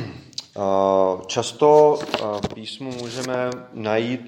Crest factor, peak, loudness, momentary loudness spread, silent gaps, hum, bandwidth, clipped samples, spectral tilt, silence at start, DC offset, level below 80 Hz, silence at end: 20 dB; -2 dBFS; -21 LUFS; 16 LU; none; none; 11.5 kHz; under 0.1%; -5 dB/octave; 0 s; under 0.1%; -56 dBFS; 0 s